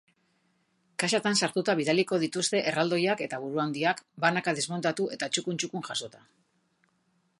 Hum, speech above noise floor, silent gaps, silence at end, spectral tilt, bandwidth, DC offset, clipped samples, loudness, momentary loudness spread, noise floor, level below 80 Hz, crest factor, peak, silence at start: none; 43 dB; none; 1.25 s; -3.5 dB/octave; 11.5 kHz; under 0.1%; under 0.1%; -28 LUFS; 7 LU; -72 dBFS; -78 dBFS; 22 dB; -8 dBFS; 1 s